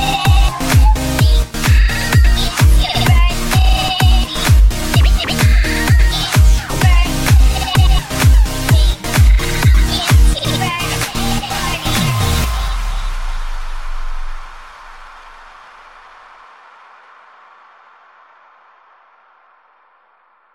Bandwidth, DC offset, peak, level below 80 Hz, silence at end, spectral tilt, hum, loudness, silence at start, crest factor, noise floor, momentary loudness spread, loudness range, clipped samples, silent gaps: 16.5 kHz; under 0.1%; 0 dBFS; -14 dBFS; 5.5 s; -4.5 dB/octave; none; -14 LUFS; 0 s; 12 dB; -54 dBFS; 14 LU; 15 LU; under 0.1%; none